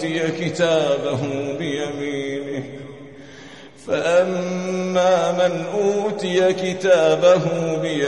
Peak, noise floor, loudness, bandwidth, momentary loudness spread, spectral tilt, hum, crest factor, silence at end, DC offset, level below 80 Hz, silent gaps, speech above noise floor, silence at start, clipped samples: -4 dBFS; -41 dBFS; -20 LUFS; 10.5 kHz; 20 LU; -5 dB/octave; none; 16 dB; 0 s; 0.3%; -62 dBFS; none; 22 dB; 0 s; under 0.1%